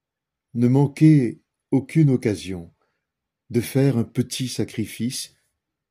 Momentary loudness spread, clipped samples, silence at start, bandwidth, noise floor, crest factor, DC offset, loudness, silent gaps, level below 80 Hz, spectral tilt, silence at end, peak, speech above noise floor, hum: 15 LU; under 0.1%; 0.55 s; 16 kHz; -85 dBFS; 18 dB; under 0.1%; -21 LUFS; none; -62 dBFS; -7 dB/octave; 0.65 s; -4 dBFS; 65 dB; none